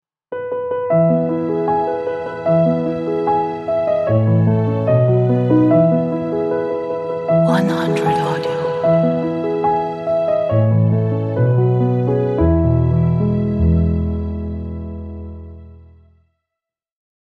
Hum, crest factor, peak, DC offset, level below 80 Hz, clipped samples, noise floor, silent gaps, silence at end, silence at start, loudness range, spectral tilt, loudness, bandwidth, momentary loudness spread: none; 14 dB; -2 dBFS; under 0.1%; -32 dBFS; under 0.1%; -84 dBFS; none; 1.55 s; 0.3 s; 4 LU; -9.5 dB/octave; -17 LUFS; 8.6 kHz; 10 LU